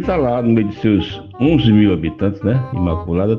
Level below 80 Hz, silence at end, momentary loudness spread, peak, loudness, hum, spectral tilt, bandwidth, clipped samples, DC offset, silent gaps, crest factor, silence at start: -34 dBFS; 0 s; 7 LU; -2 dBFS; -16 LUFS; none; -9.5 dB/octave; 6.2 kHz; under 0.1%; under 0.1%; none; 14 dB; 0 s